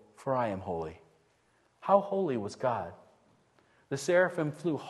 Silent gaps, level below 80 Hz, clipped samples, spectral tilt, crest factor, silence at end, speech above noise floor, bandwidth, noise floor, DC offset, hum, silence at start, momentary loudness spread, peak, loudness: none; -68 dBFS; under 0.1%; -6 dB/octave; 22 dB; 0 s; 39 dB; 12.5 kHz; -69 dBFS; under 0.1%; none; 0.2 s; 13 LU; -10 dBFS; -31 LUFS